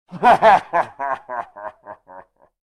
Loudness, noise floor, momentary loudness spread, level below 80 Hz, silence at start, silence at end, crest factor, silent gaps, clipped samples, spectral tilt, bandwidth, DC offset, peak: -17 LUFS; -45 dBFS; 22 LU; -56 dBFS; 0.1 s; 0.55 s; 16 dB; none; under 0.1%; -5 dB/octave; 12 kHz; under 0.1%; -4 dBFS